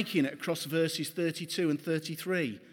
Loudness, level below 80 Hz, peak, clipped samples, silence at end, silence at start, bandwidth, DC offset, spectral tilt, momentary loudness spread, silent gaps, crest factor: -32 LUFS; -84 dBFS; -16 dBFS; under 0.1%; 0 s; 0 s; 19 kHz; under 0.1%; -5 dB/octave; 3 LU; none; 16 dB